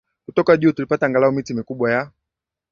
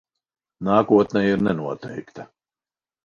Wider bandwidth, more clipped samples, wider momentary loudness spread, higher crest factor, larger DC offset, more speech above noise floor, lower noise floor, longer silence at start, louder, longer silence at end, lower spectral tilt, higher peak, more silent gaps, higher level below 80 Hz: about the same, 7.2 kHz vs 7 kHz; neither; second, 9 LU vs 20 LU; about the same, 18 dB vs 20 dB; neither; second, 66 dB vs over 70 dB; second, -84 dBFS vs under -90 dBFS; second, 0.35 s vs 0.6 s; about the same, -19 LUFS vs -20 LUFS; second, 0.65 s vs 0.8 s; about the same, -7.5 dB/octave vs -8 dB/octave; about the same, -2 dBFS vs -2 dBFS; neither; about the same, -58 dBFS vs -56 dBFS